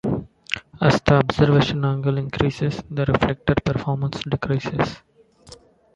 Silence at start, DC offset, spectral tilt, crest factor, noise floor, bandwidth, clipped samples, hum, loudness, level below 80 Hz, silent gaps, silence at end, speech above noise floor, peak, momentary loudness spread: 0.05 s; under 0.1%; -7 dB/octave; 20 dB; -47 dBFS; 7.8 kHz; under 0.1%; none; -21 LUFS; -42 dBFS; none; 0.4 s; 27 dB; -2 dBFS; 10 LU